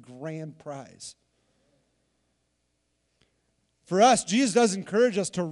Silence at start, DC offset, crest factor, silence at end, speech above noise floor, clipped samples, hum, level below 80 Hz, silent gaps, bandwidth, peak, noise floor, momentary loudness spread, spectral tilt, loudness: 0.1 s; under 0.1%; 20 dB; 0 s; 50 dB; under 0.1%; none; -70 dBFS; none; 12 kHz; -8 dBFS; -75 dBFS; 21 LU; -4 dB/octave; -23 LUFS